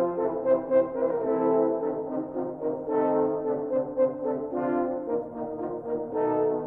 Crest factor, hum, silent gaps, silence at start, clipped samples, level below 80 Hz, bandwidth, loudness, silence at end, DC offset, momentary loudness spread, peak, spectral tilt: 16 dB; none; none; 0 s; under 0.1%; -62 dBFS; 3.3 kHz; -27 LUFS; 0 s; under 0.1%; 8 LU; -12 dBFS; -11 dB/octave